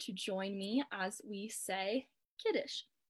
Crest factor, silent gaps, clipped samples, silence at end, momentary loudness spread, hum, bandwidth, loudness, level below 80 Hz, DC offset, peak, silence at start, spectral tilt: 16 dB; 2.25-2.37 s; under 0.1%; 0.25 s; 7 LU; none; 13.5 kHz; -39 LUFS; -88 dBFS; under 0.1%; -24 dBFS; 0 s; -3.5 dB/octave